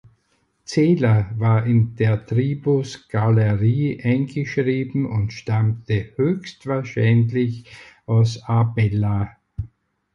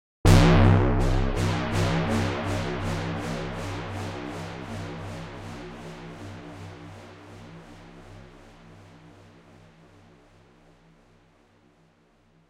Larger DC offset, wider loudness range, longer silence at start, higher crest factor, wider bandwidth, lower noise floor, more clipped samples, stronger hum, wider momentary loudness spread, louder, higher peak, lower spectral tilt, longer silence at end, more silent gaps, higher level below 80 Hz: neither; second, 3 LU vs 25 LU; first, 0.7 s vs 0.25 s; second, 14 dB vs 22 dB; second, 7.4 kHz vs 14.5 kHz; first, -66 dBFS vs -61 dBFS; neither; neither; second, 9 LU vs 27 LU; first, -21 LUFS vs -25 LUFS; about the same, -6 dBFS vs -4 dBFS; first, -8 dB/octave vs -6.5 dB/octave; second, 0.5 s vs 3.7 s; neither; second, -46 dBFS vs -34 dBFS